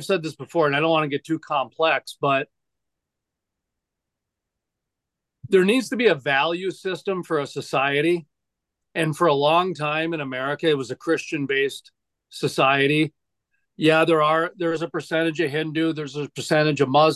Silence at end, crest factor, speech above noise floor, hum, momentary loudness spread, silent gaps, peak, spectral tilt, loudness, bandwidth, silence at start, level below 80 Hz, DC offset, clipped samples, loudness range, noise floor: 0 s; 18 dB; 62 dB; none; 9 LU; none; -4 dBFS; -5.5 dB/octave; -22 LUFS; 12.5 kHz; 0 s; -72 dBFS; under 0.1%; under 0.1%; 5 LU; -84 dBFS